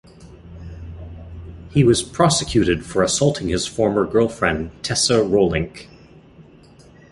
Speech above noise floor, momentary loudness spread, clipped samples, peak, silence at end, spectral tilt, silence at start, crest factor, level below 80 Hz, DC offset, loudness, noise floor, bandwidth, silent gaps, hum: 29 dB; 21 LU; under 0.1%; -2 dBFS; 0.7 s; -4.5 dB/octave; 0.2 s; 18 dB; -40 dBFS; under 0.1%; -18 LUFS; -47 dBFS; 11.5 kHz; none; none